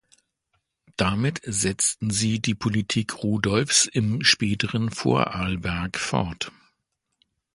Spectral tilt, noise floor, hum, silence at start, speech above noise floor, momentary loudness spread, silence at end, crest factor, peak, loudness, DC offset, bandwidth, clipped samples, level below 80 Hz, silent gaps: -3.5 dB/octave; -78 dBFS; none; 1 s; 54 dB; 8 LU; 1.05 s; 22 dB; -4 dBFS; -23 LUFS; under 0.1%; 11.5 kHz; under 0.1%; -46 dBFS; none